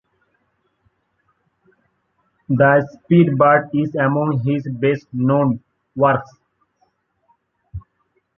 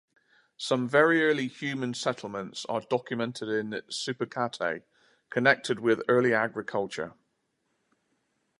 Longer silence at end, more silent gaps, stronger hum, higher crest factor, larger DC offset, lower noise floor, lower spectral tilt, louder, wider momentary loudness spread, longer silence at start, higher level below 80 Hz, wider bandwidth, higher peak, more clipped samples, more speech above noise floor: second, 0.6 s vs 1.5 s; neither; neither; second, 18 dB vs 24 dB; neither; second, -67 dBFS vs -77 dBFS; first, -10 dB/octave vs -4.5 dB/octave; first, -17 LUFS vs -28 LUFS; first, 19 LU vs 12 LU; first, 2.5 s vs 0.6 s; first, -52 dBFS vs -74 dBFS; second, 6 kHz vs 11.5 kHz; first, -2 dBFS vs -6 dBFS; neither; about the same, 51 dB vs 49 dB